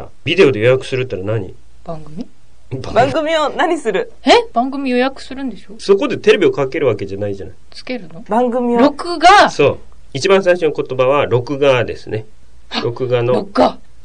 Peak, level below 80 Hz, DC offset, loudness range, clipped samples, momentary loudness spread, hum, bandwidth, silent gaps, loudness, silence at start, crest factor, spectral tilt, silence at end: 0 dBFS; -44 dBFS; 3%; 4 LU; under 0.1%; 17 LU; none; 10 kHz; none; -14 LUFS; 0 s; 14 dB; -5.5 dB/octave; 0.3 s